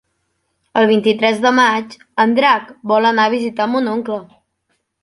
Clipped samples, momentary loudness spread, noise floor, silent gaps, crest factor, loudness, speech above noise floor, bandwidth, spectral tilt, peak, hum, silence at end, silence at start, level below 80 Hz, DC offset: under 0.1%; 10 LU; -68 dBFS; none; 14 dB; -15 LUFS; 53 dB; 11.5 kHz; -4.5 dB/octave; -2 dBFS; none; 0.8 s; 0.75 s; -64 dBFS; under 0.1%